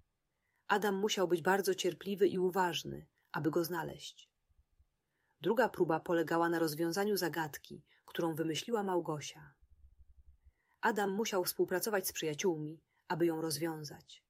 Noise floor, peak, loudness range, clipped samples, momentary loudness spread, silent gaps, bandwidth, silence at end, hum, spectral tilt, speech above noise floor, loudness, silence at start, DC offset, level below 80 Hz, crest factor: -83 dBFS; -14 dBFS; 5 LU; under 0.1%; 13 LU; none; 16 kHz; 0.1 s; none; -4.5 dB/octave; 49 dB; -35 LUFS; 0.7 s; under 0.1%; -72 dBFS; 22 dB